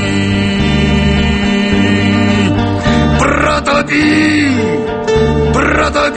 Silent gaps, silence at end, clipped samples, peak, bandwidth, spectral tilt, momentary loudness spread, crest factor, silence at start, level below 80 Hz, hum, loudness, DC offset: none; 0 s; under 0.1%; 0 dBFS; 8.8 kHz; -6 dB/octave; 3 LU; 12 dB; 0 s; -22 dBFS; none; -11 LUFS; under 0.1%